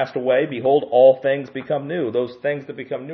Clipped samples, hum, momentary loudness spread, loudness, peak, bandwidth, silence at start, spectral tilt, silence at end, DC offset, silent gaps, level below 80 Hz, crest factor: under 0.1%; none; 13 LU; -19 LUFS; -2 dBFS; 5.8 kHz; 0 s; -8.5 dB/octave; 0 s; under 0.1%; none; -70 dBFS; 16 dB